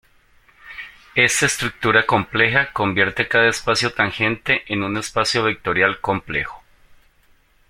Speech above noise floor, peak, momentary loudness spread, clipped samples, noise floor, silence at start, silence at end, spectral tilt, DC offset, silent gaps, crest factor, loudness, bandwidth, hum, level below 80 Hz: 37 dB; 0 dBFS; 9 LU; under 0.1%; -56 dBFS; 0.65 s; 0.75 s; -3 dB/octave; under 0.1%; none; 20 dB; -18 LUFS; 16.5 kHz; none; -48 dBFS